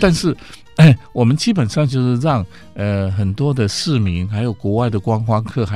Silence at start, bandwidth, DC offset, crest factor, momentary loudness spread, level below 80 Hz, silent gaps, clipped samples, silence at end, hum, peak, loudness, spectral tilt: 0 s; 12 kHz; 0.8%; 16 dB; 10 LU; -40 dBFS; none; under 0.1%; 0 s; none; 0 dBFS; -17 LUFS; -6.5 dB/octave